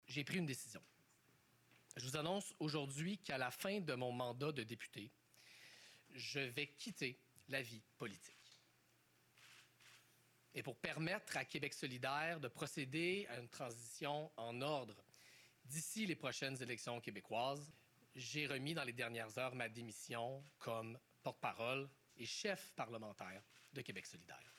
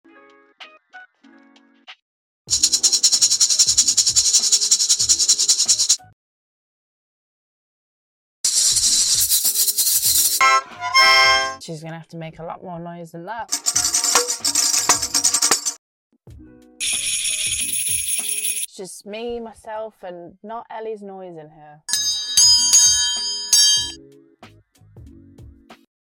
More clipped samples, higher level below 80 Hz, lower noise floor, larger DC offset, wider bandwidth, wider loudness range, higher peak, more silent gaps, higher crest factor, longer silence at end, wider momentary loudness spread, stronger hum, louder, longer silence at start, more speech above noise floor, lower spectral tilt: neither; second, -86 dBFS vs -54 dBFS; first, -76 dBFS vs -53 dBFS; neither; about the same, 17.5 kHz vs 17 kHz; second, 5 LU vs 8 LU; second, -24 dBFS vs -2 dBFS; second, none vs 2.02-2.45 s, 6.13-8.44 s, 15.78-16.10 s; first, 24 dB vs 18 dB; second, 0 s vs 0.4 s; second, 18 LU vs 21 LU; neither; second, -46 LUFS vs -15 LUFS; second, 0.1 s vs 0.6 s; first, 29 dB vs 24 dB; first, -4 dB/octave vs 1.5 dB/octave